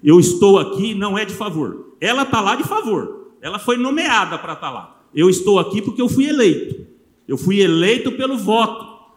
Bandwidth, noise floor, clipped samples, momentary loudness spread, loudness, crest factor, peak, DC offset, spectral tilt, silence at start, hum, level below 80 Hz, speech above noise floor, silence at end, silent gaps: 16.5 kHz; -42 dBFS; under 0.1%; 15 LU; -17 LUFS; 16 dB; 0 dBFS; under 0.1%; -5 dB/octave; 0.05 s; none; -56 dBFS; 26 dB; 0.25 s; none